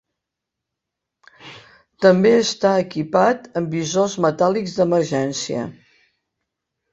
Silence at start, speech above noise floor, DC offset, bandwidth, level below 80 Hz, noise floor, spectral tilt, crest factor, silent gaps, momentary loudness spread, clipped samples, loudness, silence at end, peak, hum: 1.45 s; 65 dB; under 0.1%; 8.2 kHz; -62 dBFS; -83 dBFS; -5 dB/octave; 18 dB; none; 10 LU; under 0.1%; -19 LUFS; 1.2 s; -2 dBFS; none